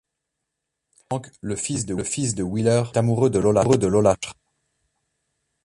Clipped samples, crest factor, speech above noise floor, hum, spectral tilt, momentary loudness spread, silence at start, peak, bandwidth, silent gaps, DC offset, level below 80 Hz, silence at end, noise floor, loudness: under 0.1%; 20 dB; 60 dB; none; -6 dB/octave; 13 LU; 1.1 s; -4 dBFS; 11.5 kHz; none; under 0.1%; -48 dBFS; 1.3 s; -81 dBFS; -22 LUFS